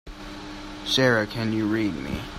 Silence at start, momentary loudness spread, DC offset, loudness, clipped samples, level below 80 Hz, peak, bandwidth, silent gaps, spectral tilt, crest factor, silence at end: 0.05 s; 18 LU; under 0.1%; -24 LUFS; under 0.1%; -44 dBFS; -6 dBFS; 16 kHz; none; -5 dB/octave; 20 dB; 0 s